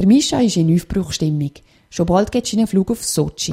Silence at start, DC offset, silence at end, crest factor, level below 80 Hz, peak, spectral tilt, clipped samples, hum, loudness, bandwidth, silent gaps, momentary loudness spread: 0 s; under 0.1%; 0 s; 14 dB; -40 dBFS; -2 dBFS; -5.5 dB/octave; under 0.1%; none; -18 LUFS; 16 kHz; none; 8 LU